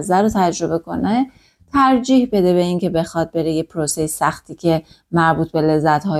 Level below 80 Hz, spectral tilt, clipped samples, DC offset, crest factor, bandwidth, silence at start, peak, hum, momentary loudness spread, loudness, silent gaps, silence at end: -46 dBFS; -5.5 dB/octave; under 0.1%; under 0.1%; 14 dB; 15 kHz; 0 s; -4 dBFS; none; 7 LU; -18 LUFS; none; 0 s